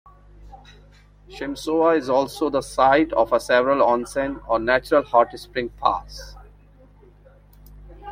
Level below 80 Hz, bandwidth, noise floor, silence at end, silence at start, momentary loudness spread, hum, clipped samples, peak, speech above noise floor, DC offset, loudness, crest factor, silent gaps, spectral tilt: -46 dBFS; 16 kHz; -50 dBFS; 0 s; 0.4 s; 14 LU; 50 Hz at -45 dBFS; under 0.1%; -2 dBFS; 30 dB; under 0.1%; -21 LUFS; 20 dB; none; -4.5 dB/octave